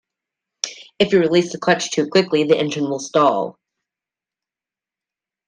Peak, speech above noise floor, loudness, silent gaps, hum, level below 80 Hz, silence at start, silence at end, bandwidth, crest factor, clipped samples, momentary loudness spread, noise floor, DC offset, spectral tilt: -2 dBFS; 72 dB; -18 LUFS; none; none; -62 dBFS; 0.65 s; 1.95 s; 10 kHz; 18 dB; under 0.1%; 11 LU; -89 dBFS; under 0.1%; -4.5 dB/octave